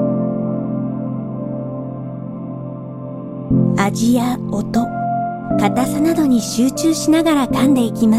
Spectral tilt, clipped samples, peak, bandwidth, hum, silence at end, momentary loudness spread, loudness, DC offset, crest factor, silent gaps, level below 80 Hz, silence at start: -6 dB/octave; under 0.1%; -2 dBFS; 15.5 kHz; none; 0 s; 13 LU; -18 LUFS; under 0.1%; 14 dB; none; -44 dBFS; 0 s